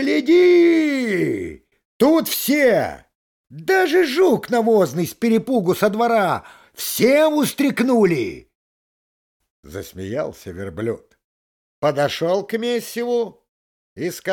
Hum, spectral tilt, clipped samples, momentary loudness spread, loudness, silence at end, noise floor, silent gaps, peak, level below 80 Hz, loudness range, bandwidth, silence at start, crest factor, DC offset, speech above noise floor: none; -5 dB/octave; under 0.1%; 14 LU; -18 LUFS; 0 s; under -90 dBFS; 1.85-2.00 s, 3.15-3.44 s, 8.55-9.40 s, 9.50-9.63 s, 11.24-11.82 s, 13.49-13.96 s; -4 dBFS; -58 dBFS; 9 LU; 19 kHz; 0 s; 16 dB; under 0.1%; over 72 dB